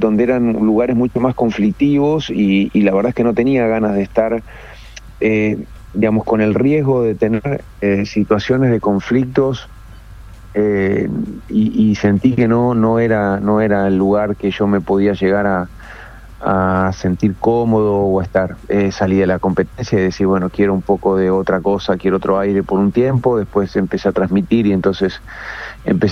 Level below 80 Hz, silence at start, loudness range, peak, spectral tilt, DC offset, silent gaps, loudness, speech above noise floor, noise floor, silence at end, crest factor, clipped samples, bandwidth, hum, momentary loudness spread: -40 dBFS; 0 s; 3 LU; -2 dBFS; -8 dB/octave; under 0.1%; none; -16 LUFS; 21 dB; -36 dBFS; 0 s; 14 dB; under 0.1%; 6.8 kHz; none; 6 LU